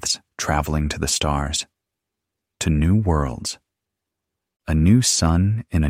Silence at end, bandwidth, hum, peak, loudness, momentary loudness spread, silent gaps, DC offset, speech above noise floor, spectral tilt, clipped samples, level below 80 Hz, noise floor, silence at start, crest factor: 0 s; 16 kHz; none; -4 dBFS; -20 LUFS; 13 LU; none; under 0.1%; 64 dB; -4.5 dB/octave; under 0.1%; -30 dBFS; -83 dBFS; 0 s; 16 dB